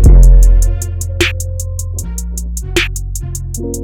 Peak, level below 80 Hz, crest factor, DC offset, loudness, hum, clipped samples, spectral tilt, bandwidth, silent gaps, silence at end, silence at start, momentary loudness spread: 0 dBFS; -10 dBFS; 10 dB; under 0.1%; -15 LUFS; none; under 0.1%; -4.5 dB/octave; 15 kHz; none; 0 s; 0 s; 14 LU